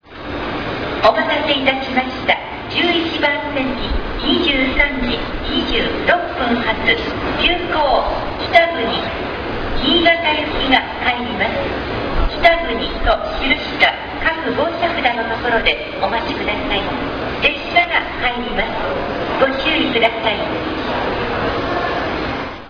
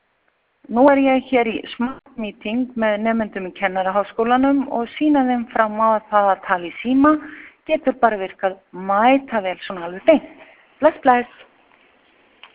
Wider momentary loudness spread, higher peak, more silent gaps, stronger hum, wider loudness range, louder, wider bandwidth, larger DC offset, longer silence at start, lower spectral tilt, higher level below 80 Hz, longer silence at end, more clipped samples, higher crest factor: second, 8 LU vs 11 LU; about the same, 0 dBFS vs 0 dBFS; neither; neither; about the same, 2 LU vs 3 LU; about the same, -17 LUFS vs -19 LUFS; first, 5.4 kHz vs 4 kHz; neither; second, 0.05 s vs 0.7 s; second, -6 dB/octave vs -9 dB/octave; first, -30 dBFS vs -56 dBFS; second, 0 s vs 1.3 s; neither; about the same, 18 dB vs 20 dB